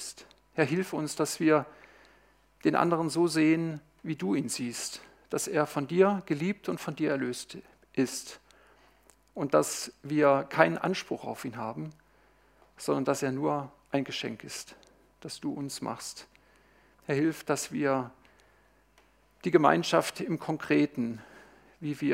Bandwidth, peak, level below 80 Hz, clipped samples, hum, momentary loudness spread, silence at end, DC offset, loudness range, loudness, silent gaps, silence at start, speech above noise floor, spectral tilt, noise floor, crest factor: 16 kHz; -4 dBFS; -70 dBFS; under 0.1%; none; 16 LU; 0 s; under 0.1%; 6 LU; -30 LUFS; none; 0 s; 35 dB; -5 dB/octave; -64 dBFS; 26 dB